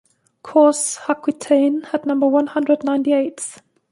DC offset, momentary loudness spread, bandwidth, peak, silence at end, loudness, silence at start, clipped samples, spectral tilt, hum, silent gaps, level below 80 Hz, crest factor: under 0.1%; 8 LU; 11.5 kHz; -2 dBFS; 0.4 s; -18 LUFS; 0.45 s; under 0.1%; -3.5 dB/octave; none; none; -70 dBFS; 16 dB